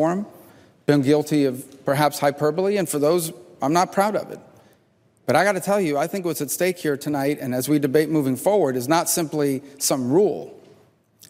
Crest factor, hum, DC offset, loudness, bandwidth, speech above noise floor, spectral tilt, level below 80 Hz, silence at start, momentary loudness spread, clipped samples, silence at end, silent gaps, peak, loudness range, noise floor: 18 dB; none; under 0.1%; -21 LUFS; 16 kHz; 40 dB; -5 dB/octave; -66 dBFS; 0 s; 9 LU; under 0.1%; 0.75 s; none; -4 dBFS; 2 LU; -60 dBFS